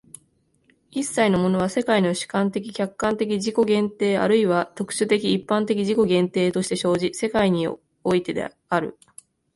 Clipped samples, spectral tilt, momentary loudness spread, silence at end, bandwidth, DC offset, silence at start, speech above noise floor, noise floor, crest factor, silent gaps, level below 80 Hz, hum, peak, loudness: under 0.1%; -5.5 dB/octave; 8 LU; 0.65 s; 11.5 kHz; under 0.1%; 0.95 s; 43 dB; -64 dBFS; 18 dB; none; -58 dBFS; none; -6 dBFS; -22 LUFS